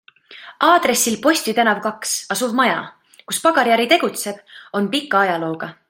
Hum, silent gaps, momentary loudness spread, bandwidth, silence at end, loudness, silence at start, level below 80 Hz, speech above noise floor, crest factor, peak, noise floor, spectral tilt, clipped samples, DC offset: none; none; 12 LU; 16.5 kHz; 0.15 s; -18 LUFS; 0.3 s; -66 dBFS; 24 dB; 18 dB; 0 dBFS; -42 dBFS; -2.5 dB/octave; under 0.1%; under 0.1%